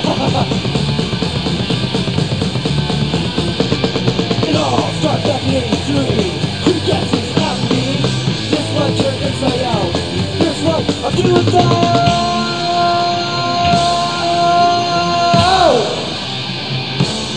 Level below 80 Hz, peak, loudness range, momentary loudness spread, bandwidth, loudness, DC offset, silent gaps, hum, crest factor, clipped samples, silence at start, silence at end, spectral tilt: -36 dBFS; 0 dBFS; 3 LU; 6 LU; 10 kHz; -15 LUFS; 0.9%; none; none; 14 dB; under 0.1%; 0 s; 0 s; -5.5 dB/octave